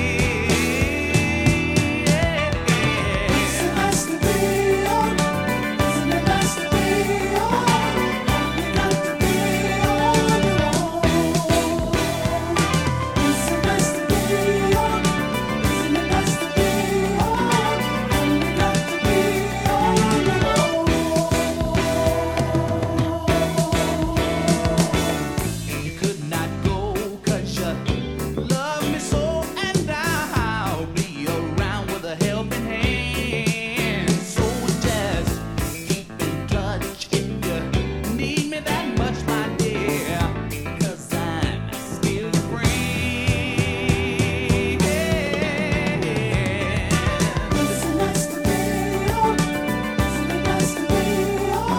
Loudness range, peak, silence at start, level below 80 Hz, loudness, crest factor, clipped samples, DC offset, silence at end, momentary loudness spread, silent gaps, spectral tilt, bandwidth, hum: 4 LU; -4 dBFS; 0 s; -34 dBFS; -21 LUFS; 18 dB; under 0.1%; under 0.1%; 0 s; 6 LU; none; -5 dB/octave; 18 kHz; none